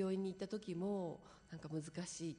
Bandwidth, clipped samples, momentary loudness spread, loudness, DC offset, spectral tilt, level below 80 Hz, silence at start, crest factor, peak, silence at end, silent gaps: 10 kHz; under 0.1%; 12 LU; -45 LUFS; under 0.1%; -6 dB/octave; -74 dBFS; 0 s; 14 dB; -30 dBFS; 0 s; none